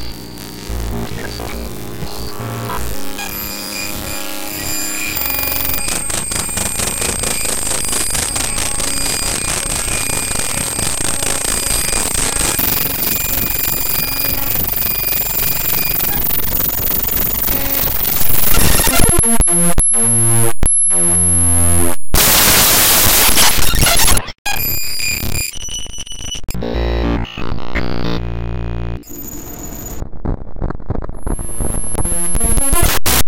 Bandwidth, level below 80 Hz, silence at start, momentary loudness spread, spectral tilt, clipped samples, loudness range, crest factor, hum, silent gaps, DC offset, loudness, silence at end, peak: 17.5 kHz; -24 dBFS; 0 s; 16 LU; -2 dB/octave; under 0.1%; 14 LU; 14 dB; none; 24.38-24.45 s; under 0.1%; -14 LUFS; 0 s; 0 dBFS